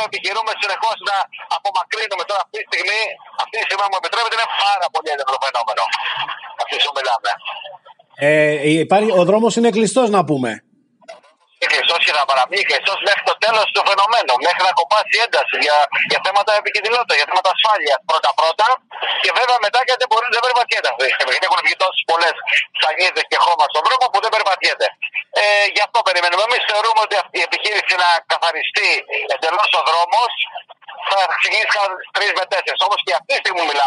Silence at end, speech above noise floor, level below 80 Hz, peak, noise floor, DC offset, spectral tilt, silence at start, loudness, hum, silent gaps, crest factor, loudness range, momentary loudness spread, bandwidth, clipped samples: 0 s; 28 dB; -82 dBFS; -2 dBFS; -45 dBFS; under 0.1%; -2.5 dB/octave; 0 s; -16 LUFS; none; none; 16 dB; 4 LU; 7 LU; 11 kHz; under 0.1%